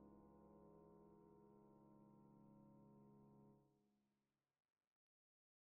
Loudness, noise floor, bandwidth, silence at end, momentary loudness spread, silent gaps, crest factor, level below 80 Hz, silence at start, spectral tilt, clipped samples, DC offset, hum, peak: -69 LUFS; under -90 dBFS; 1.5 kHz; 1.35 s; 2 LU; none; 14 dB; -88 dBFS; 0 s; -4 dB/octave; under 0.1%; under 0.1%; none; -56 dBFS